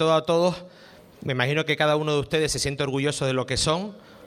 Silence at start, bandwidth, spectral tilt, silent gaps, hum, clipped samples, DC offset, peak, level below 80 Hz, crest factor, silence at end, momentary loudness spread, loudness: 0 s; 15.5 kHz; -4.5 dB/octave; none; none; under 0.1%; under 0.1%; -6 dBFS; -48 dBFS; 18 dB; 0 s; 8 LU; -24 LUFS